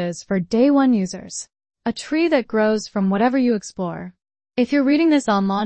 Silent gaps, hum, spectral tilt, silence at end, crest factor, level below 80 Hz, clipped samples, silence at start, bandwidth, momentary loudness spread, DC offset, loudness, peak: none; none; -5.5 dB/octave; 0 s; 14 dB; -58 dBFS; under 0.1%; 0 s; 8.8 kHz; 14 LU; under 0.1%; -19 LUFS; -4 dBFS